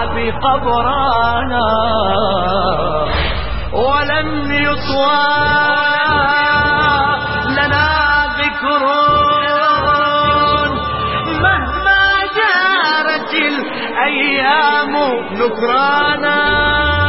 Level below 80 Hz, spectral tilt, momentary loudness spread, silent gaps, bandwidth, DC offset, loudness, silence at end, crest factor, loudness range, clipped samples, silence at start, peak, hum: -30 dBFS; -8.5 dB/octave; 5 LU; none; 5.8 kHz; under 0.1%; -13 LUFS; 0 s; 14 dB; 3 LU; under 0.1%; 0 s; 0 dBFS; none